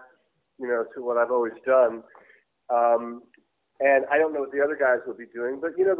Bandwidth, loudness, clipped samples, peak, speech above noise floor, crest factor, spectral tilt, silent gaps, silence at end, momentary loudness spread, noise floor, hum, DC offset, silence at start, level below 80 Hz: 3.7 kHz; -24 LUFS; under 0.1%; -8 dBFS; 42 dB; 16 dB; -8.5 dB/octave; none; 0 s; 14 LU; -66 dBFS; none; under 0.1%; 0.6 s; -72 dBFS